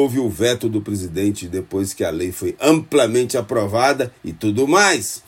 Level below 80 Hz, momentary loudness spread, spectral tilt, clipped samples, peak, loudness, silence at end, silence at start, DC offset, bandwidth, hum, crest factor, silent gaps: -50 dBFS; 10 LU; -4.5 dB/octave; under 0.1%; 0 dBFS; -19 LUFS; 0.1 s; 0 s; under 0.1%; 16.5 kHz; none; 18 dB; none